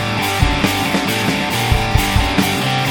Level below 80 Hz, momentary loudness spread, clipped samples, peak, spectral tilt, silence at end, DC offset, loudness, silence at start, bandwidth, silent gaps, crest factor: -24 dBFS; 1 LU; under 0.1%; 0 dBFS; -4.5 dB/octave; 0 s; under 0.1%; -16 LUFS; 0 s; 17.5 kHz; none; 16 dB